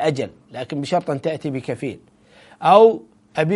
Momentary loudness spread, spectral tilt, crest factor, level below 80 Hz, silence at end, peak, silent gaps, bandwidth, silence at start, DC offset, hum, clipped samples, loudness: 18 LU; -6.5 dB/octave; 20 dB; -62 dBFS; 0 s; 0 dBFS; none; 11.5 kHz; 0 s; under 0.1%; none; under 0.1%; -19 LUFS